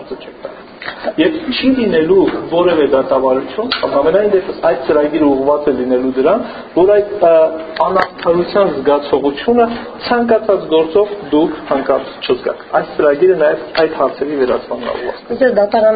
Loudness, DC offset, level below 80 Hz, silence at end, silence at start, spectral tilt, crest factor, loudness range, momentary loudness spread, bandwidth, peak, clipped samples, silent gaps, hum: -14 LUFS; under 0.1%; -46 dBFS; 0 s; 0 s; -3.5 dB/octave; 14 dB; 2 LU; 8 LU; 5 kHz; 0 dBFS; under 0.1%; none; none